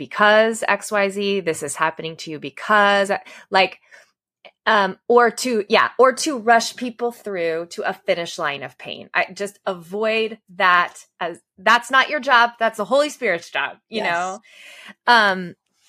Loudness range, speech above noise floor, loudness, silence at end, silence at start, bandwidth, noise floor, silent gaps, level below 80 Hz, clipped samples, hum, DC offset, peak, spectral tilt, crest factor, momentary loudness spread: 4 LU; 32 dB; -19 LUFS; 0.35 s; 0 s; 15.5 kHz; -52 dBFS; none; -74 dBFS; under 0.1%; none; under 0.1%; 0 dBFS; -3 dB/octave; 20 dB; 14 LU